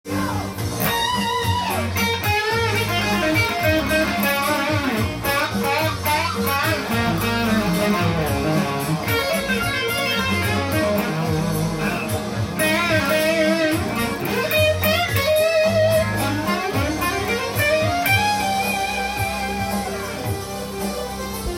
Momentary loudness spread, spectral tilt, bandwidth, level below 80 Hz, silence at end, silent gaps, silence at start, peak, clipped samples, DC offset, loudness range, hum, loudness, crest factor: 7 LU; -4.5 dB/octave; 17 kHz; -40 dBFS; 0 s; none; 0.05 s; -6 dBFS; under 0.1%; under 0.1%; 2 LU; none; -20 LUFS; 16 dB